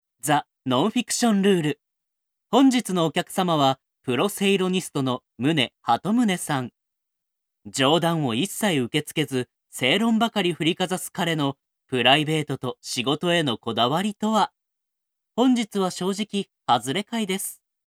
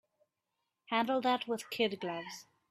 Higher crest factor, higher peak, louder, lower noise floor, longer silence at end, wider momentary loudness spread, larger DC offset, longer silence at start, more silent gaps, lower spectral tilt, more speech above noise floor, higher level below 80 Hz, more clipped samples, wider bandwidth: about the same, 22 dB vs 20 dB; first, -2 dBFS vs -16 dBFS; first, -23 LUFS vs -34 LUFS; second, -79 dBFS vs -86 dBFS; about the same, 0.3 s vs 0.3 s; second, 9 LU vs 13 LU; neither; second, 0.25 s vs 0.9 s; neither; about the same, -4.5 dB/octave vs -4 dB/octave; first, 56 dB vs 52 dB; first, -70 dBFS vs -84 dBFS; neither; about the same, 16.5 kHz vs 15 kHz